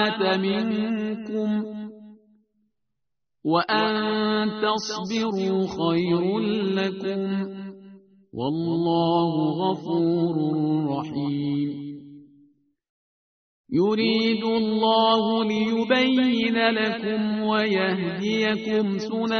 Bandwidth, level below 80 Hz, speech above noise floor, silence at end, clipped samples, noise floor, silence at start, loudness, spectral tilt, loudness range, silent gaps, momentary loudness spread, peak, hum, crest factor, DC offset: 6.6 kHz; -64 dBFS; 61 dB; 0 s; under 0.1%; -84 dBFS; 0 s; -23 LUFS; -4 dB/octave; 6 LU; 12.89-13.64 s; 8 LU; -4 dBFS; none; 20 dB; under 0.1%